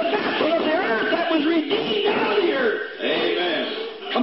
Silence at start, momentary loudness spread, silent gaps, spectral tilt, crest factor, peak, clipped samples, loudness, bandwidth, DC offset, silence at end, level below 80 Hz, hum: 0 s; 5 LU; none; -8.5 dB/octave; 14 dB; -8 dBFS; under 0.1%; -21 LUFS; 5.8 kHz; 0.2%; 0 s; -68 dBFS; none